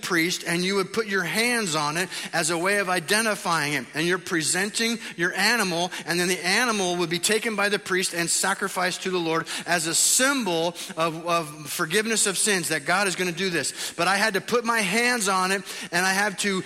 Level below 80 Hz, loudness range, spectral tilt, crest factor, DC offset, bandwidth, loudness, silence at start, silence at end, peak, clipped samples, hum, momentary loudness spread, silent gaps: -68 dBFS; 1 LU; -2.5 dB/octave; 18 dB; under 0.1%; 16 kHz; -23 LUFS; 0 s; 0 s; -6 dBFS; under 0.1%; none; 6 LU; none